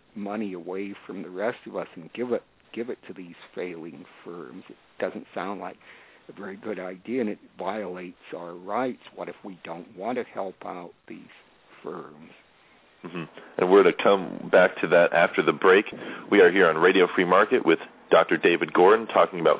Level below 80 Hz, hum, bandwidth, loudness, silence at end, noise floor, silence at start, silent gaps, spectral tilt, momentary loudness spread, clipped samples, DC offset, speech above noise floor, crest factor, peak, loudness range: -72 dBFS; none; 4 kHz; -23 LUFS; 0 s; -58 dBFS; 0.15 s; none; -9 dB/octave; 22 LU; under 0.1%; under 0.1%; 34 dB; 20 dB; -4 dBFS; 17 LU